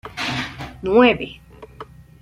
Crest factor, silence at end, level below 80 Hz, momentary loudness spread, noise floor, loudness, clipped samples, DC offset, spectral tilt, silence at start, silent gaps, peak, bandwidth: 18 dB; 0.4 s; -46 dBFS; 25 LU; -41 dBFS; -19 LUFS; under 0.1%; under 0.1%; -5.5 dB/octave; 0.05 s; none; -2 dBFS; 12.5 kHz